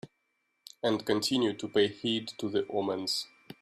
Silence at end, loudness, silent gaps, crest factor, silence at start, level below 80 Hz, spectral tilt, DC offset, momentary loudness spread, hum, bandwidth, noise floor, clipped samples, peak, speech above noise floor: 0.1 s; -31 LUFS; none; 18 dB; 0.05 s; -72 dBFS; -4 dB/octave; under 0.1%; 5 LU; none; 15.5 kHz; -78 dBFS; under 0.1%; -14 dBFS; 48 dB